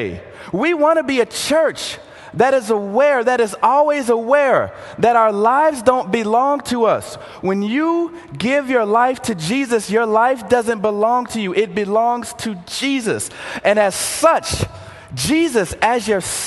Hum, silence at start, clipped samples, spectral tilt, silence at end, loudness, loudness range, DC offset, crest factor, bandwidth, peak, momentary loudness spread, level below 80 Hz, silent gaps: none; 0 s; under 0.1%; -4 dB/octave; 0 s; -17 LUFS; 3 LU; under 0.1%; 16 dB; 12.5 kHz; 0 dBFS; 11 LU; -46 dBFS; none